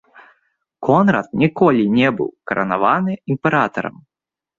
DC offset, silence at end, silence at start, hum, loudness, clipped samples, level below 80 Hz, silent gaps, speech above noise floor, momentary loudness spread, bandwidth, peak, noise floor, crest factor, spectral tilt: under 0.1%; 0.7 s; 0.8 s; none; -17 LUFS; under 0.1%; -56 dBFS; none; 49 dB; 10 LU; 7.2 kHz; -2 dBFS; -65 dBFS; 16 dB; -8 dB/octave